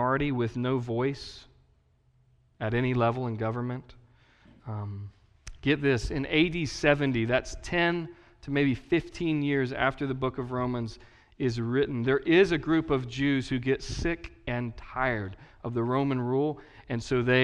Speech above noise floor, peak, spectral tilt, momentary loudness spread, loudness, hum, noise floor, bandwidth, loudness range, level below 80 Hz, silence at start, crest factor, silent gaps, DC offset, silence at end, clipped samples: 37 dB; -8 dBFS; -6.5 dB/octave; 12 LU; -28 LUFS; none; -65 dBFS; 10.5 kHz; 5 LU; -48 dBFS; 0 s; 22 dB; none; under 0.1%; 0 s; under 0.1%